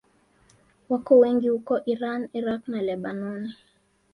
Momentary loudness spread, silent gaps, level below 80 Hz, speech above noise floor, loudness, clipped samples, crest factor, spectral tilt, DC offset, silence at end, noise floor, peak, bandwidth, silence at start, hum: 14 LU; none; -68 dBFS; 38 dB; -24 LUFS; under 0.1%; 20 dB; -8 dB/octave; under 0.1%; 0.6 s; -61 dBFS; -6 dBFS; 5 kHz; 0.9 s; none